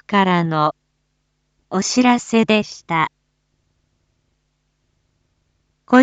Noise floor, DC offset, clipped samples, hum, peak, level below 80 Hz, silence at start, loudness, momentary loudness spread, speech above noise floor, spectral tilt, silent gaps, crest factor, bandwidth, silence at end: -69 dBFS; under 0.1%; under 0.1%; none; 0 dBFS; -62 dBFS; 0.1 s; -18 LUFS; 7 LU; 52 dB; -5 dB/octave; none; 20 dB; 9 kHz; 0 s